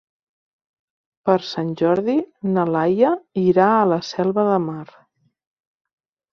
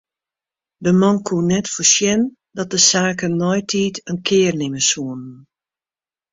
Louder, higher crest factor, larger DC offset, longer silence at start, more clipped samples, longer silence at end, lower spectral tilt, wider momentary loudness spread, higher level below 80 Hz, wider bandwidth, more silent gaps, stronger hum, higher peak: about the same, -19 LUFS vs -17 LUFS; about the same, 18 dB vs 18 dB; neither; first, 1.25 s vs 0.8 s; neither; first, 1.5 s vs 0.95 s; first, -7.5 dB/octave vs -3.5 dB/octave; second, 8 LU vs 11 LU; second, -64 dBFS vs -56 dBFS; second, 7 kHz vs 8 kHz; neither; neither; about the same, -2 dBFS vs 0 dBFS